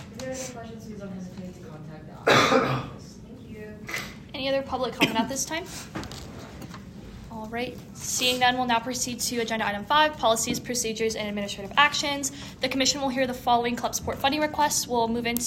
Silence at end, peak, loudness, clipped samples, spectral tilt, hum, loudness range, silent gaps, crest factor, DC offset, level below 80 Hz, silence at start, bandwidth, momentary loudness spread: 0 s; -4 dBFS; -25 LUFS; under 0.1%; -2.5 dB/octave; none; 5 LU; none; 24 dB; under 0.1%; -52 dBFS; 0 s; 16 kHz; 20 LU